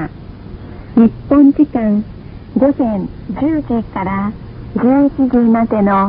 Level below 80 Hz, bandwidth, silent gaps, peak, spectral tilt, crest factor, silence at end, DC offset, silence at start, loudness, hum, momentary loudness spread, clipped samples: -36 dBFS; 5 kHz; none; 0 dBFS; -12.5 dB/octave; 14 dB; 0 s; under 0.1%; 0 s; -14 LUFS; none; 21 LU; under 0.1%